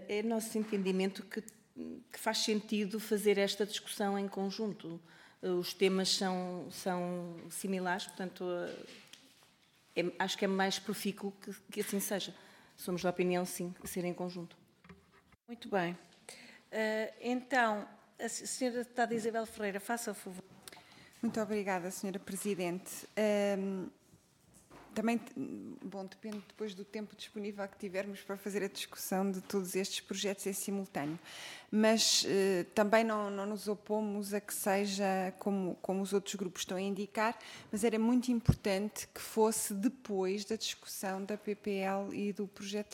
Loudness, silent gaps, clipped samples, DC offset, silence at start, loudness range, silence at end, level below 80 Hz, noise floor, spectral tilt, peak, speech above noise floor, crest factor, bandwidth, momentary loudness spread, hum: -36 LUFS; none; under 0.1%; under 0.1%; 0 s; 8 LU; 0 s; -62 dBFS; -67 dBFS; -4 dB/octave; -12 dBFS; 32 dB; 24 dB; 17 kHz; 14 LU; none